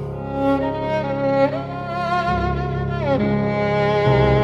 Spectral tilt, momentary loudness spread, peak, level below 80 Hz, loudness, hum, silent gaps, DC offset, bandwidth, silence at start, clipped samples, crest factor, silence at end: -8 dB/octave; 7 LU; -4 dBFS; -34 dBFS; -20 LUFS; none; none; under 0.1%; 7.4 kHz; 0 s; under 0.1%; 14 dB; 0 s